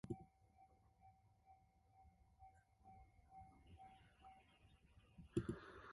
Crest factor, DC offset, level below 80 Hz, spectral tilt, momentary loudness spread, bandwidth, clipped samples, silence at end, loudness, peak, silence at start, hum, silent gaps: 28 dB; under 0.1%; -70 dBFS; -7.5 dB/octave; 21 LU; 11 kHz; under 0.1%; 0 s; -53 LUFS; -28 dBFS; 0.05 s; none; none